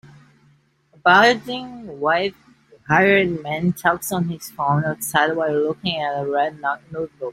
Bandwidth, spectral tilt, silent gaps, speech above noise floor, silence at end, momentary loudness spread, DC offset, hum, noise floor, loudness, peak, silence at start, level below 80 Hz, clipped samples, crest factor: 16.5 kHz; -4.5 dB/octave; none; 38 dB; 0 s; 13 LU; under 0.1%; none; -58 dBFS; -20 LUFS; -2 dBFS; 0.05 s; -58 dBFS; under 0.1%; 20 dB